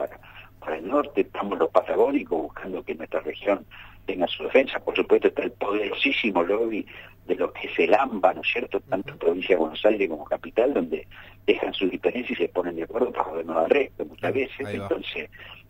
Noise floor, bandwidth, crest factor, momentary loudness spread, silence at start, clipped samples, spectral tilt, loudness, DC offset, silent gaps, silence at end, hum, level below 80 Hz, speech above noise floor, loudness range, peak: -46 dBFS; 16 kHz; 20 dB; 12 LU; 0 s; under 0.1%; -6.5 dB/octave; -25 LUFS; under 0.1%; none; 0.1 s; none; -54 dBFS; 21 dB; 3 LU; -4 dBFS